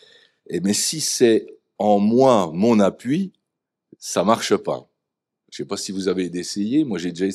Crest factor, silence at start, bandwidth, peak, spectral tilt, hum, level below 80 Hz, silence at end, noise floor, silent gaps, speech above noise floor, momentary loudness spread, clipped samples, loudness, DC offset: 20 dB; 0.5 s; 14.5 kHz; -2 dBFS; -4.5 dB/octave; none; -68 dBFS; 0 s; -82 dBFS; none; 62 dB; 13 LU; under 0.1%; -20 LUFS; under 0.1%